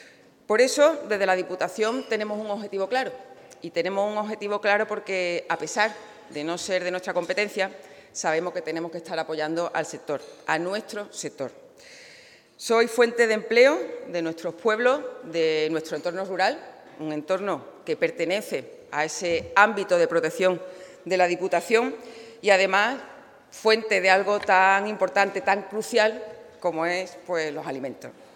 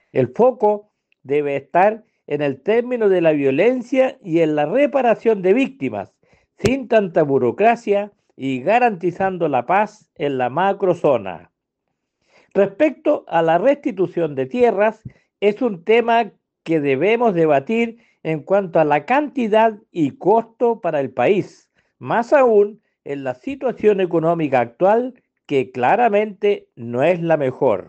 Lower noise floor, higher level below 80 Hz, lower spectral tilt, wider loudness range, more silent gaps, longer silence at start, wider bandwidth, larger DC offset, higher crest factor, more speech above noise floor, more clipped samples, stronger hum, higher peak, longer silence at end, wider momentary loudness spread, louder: second, -51 dBFS vs -77 dBFS; second, -72 dBFS vs -58 dBFS; second, -3.5 dB/octave vs -7 dB/octave; first, 7 LU vs 2 LU; neither; second, 0 s vs 0.15 s; first, 18.5 kHz vs 8.4 kHz; neither; first, 24 dB vs 14 dB; second, 27 dB vs 59 dB; neither; neither; about the same, -2 dBFS vs -4 dBFS; about the same, 0.1 s vs 0.05 s; first, 14 LU vs 10 LU; second, -24 LUFS vs -18 LUFS